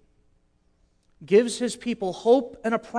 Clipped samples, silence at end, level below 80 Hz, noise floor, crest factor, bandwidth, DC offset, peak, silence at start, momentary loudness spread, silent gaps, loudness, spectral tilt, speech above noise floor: under 0.1%; 0 s; -62 dBFS; -65 dBFS; 18 dB; 11 kHz; under 0.1%; -8 dBFS; 1.2 s; 8 LU; none; -24 LUFS; -4.5 dB/octave; 42 dB